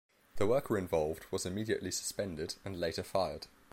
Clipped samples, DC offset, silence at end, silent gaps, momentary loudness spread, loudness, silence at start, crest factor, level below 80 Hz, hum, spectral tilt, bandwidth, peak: under 0.1%; under 0.1%; 0 s; none; 6 LU; -36 LUFS; 0.1 s; 18 dB; -58 dBFS; none; -4.5 dB/octave; 16.5 kHz; -18 dBFS